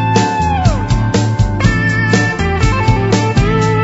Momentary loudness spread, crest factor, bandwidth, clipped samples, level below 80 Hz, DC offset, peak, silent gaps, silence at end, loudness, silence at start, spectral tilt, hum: 2 LU; 12 dB; 8 kHz; under 0.1%; -22 dBFS; under 0.1%; 0 dBFS; none; 0 s; -13 LUFS; 0 s; -6 dB/octave; none